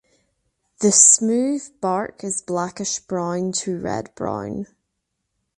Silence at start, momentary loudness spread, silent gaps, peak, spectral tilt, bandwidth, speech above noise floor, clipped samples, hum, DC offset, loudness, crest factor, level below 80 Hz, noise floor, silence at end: 0.8 s; 17 LU; none; 0 dBFS; -3 dB/octave; 11.5 kHz; 56 dB; under 0.1%; none; under 0.1%; -19 LUFS; 22 dB; -58 dBFS; -77 dBFS; 0.9 s